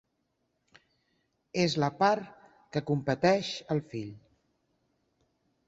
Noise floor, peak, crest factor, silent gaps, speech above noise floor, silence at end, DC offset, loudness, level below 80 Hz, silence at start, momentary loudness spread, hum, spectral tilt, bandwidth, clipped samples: -78 dBFS; -10 dBFS; 22 dB; none; 49 dB; 1.5 s; under 0.1%; -30 LUFS; -68 dBFS; 1.55 s; 14 LU; none; -5.5 dB/octave; 8 kHz; under 0.1%